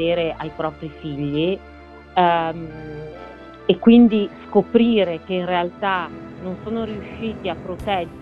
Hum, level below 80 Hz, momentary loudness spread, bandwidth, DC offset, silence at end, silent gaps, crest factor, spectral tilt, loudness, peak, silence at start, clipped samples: none; -46 dBFS; 17 LU; 4.9 kHz; under 0.1%; 0 s; none; 20 dB; -8.5 dB/octave; -20 LUFS; -2 dBFS; 0 s; under 0.1%